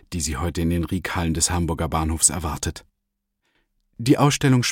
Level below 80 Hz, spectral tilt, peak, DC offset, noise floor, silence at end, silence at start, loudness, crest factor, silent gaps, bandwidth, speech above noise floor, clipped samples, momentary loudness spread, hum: -36 dBFS; -4 dB/octave; -4 dBFS; under 0.1%; -78 dBFS; 0 s; 0.1 s; -22 LUFS; 20 dB; none; 17 kHz; 56 dB; under 0.1%; 10 LU; none